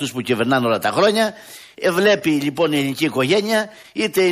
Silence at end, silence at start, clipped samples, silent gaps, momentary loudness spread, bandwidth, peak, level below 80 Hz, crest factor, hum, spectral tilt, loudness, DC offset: 0 s; 0 s; under 0.1%; none; 7 LU; 15.5 kHz; -2 dBFS; -62 dBFS; 16 dB; none; -4.5 dB/octave; -18 LUFS; under 0.1%